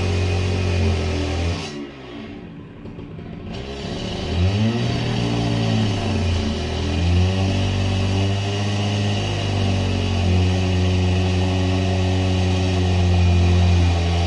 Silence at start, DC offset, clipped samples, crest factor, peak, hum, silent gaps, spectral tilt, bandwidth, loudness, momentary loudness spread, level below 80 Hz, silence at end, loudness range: 0 s; under 0.1%; under 0.1%; 12 dB; -8 dBFS; none; none; -6.5 dB/octave; 10.5 kHz; -20 LUFS; 16 LU; -36 dBFS; 0 s; 7 LU